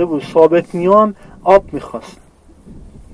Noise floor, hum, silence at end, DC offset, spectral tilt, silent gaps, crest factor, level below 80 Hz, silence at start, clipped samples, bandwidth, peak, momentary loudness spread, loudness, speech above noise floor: -41 dBFS; none; 0.25 s; under 0.1%; -7.5 dB/octave; none; 14 dB; -42 dBFS; 0 s; 0.1%; 11 kHz; 0 dBFS; 15 LU; -13 LUFS; 28 dB